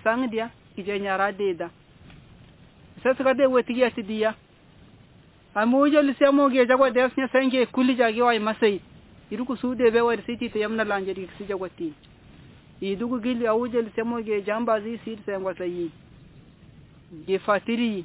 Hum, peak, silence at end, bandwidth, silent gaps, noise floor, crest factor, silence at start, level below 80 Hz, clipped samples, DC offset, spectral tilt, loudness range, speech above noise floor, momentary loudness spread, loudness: none; -6 dBFS; 0 s; 4 kHz; none; -53 dBFS; 18 dB; 0.05 s; -58 dBFS; under 0.1%; under 0.1%; -9 dB/octave; 9 LU; 30 dB; 14 LU; -24 LUFS